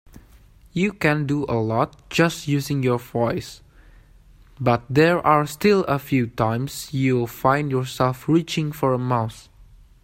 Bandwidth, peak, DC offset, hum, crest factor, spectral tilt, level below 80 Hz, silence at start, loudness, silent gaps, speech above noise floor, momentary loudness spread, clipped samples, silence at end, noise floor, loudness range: 16 kHz; -2 dBFS; under 0.1%; none; 20 dB; -6.5 dB/octave; -50 dBFS; 0.15 s; -22 LUFS; none; 29 dB; 7 LU; under 0.1%; 0.4 s; -50 dBFS; 3 LU